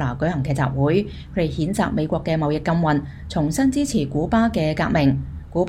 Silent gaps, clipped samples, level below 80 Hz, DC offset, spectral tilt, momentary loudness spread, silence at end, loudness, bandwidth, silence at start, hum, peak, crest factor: none; under 0.1%; -38 dBFS; under 0.1%; -6.5 dB/octave; 6 LU; 0 s; -21 LUFS; 15 kHz; 0 s; none; -6 dBFS; 16 dB